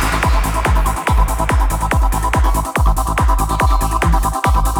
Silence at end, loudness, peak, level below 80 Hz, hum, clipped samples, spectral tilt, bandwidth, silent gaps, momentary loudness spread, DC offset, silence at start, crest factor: 0 s; -16 LUFS; -2 dBFS; -16 dBFS; none; under 0.1%; -5 dB/octave; 19.5 kHz; none; 1 LU; under 0.1%; 0 s; 12 dB